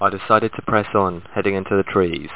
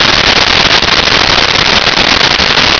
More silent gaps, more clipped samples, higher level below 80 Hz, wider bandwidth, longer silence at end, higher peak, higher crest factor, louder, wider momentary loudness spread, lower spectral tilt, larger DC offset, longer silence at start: neither; neither; second, -44 dBFS vs -26 dBFS; second, 4 kHz vs 5.4 kHz; about the same, 0 s vs 0 s; about the same, 0 dBFS vs 0 dBFS; first, 18 dB vs 8 dB; second, -19 LUFS vs -5 LUFS; first, 4 LU vs 1 LU; first, -10 dB/octave vs -2 dB/octave; first, 0.8% vs under 0.1%; about the same, 0 s vs 0 s